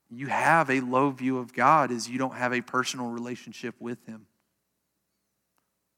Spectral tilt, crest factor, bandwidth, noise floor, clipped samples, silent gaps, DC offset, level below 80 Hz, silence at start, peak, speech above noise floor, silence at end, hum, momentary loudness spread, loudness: -4.5 dB/octave; 20 dB; 16.5 kHz; -79 dBFS; under 0.1%; none; under 0.1%; -82 dBFS; 0.1 s; -8 dBFS; 52 dB; 1.8 s; none; 17 LU; -26 LUFS